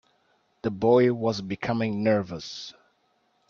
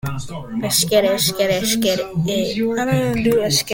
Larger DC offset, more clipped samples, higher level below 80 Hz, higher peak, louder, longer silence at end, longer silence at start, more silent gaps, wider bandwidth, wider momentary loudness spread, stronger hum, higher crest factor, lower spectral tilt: neither; neither; second, -62 dBFS vs -46 dBFS; second, -8 dBFS vs -2 dBFS; second, -25 LUFS vs -18 LUFS; first, 0.8 s vs 0 s; first, 0.65 s vs 0.05 s; neither; second, 7.2 kHz vs 17 kHz; first, 16 LU vs 9 LU; neither; about the same, 18 dB vs 16 dB; first, -6.5 dB/octave vs -4 dB/octave